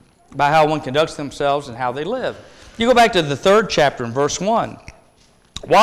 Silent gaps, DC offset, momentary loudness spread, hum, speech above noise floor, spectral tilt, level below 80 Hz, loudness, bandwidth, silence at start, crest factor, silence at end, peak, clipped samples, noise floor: none; under 0.1%; 14 LU; none; 36 dB; -4.5 dB/octave; -46 dBFS; -18 LUFS; 16 kHz; 0.3 s; 12 dB; 0 s; -6 dBFS; under 0.1%; -53 dBFS